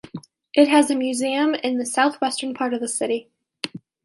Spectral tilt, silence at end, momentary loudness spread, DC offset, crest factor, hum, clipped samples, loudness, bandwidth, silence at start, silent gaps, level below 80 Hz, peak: -3 dB/octave; 0.25 s; 16 LU; under 0.1%; 18 dB; none; under 0.1%; -21 LUFS; 11.5 kHz; 0.15 s; none; -70 dBFS; -4 dBFS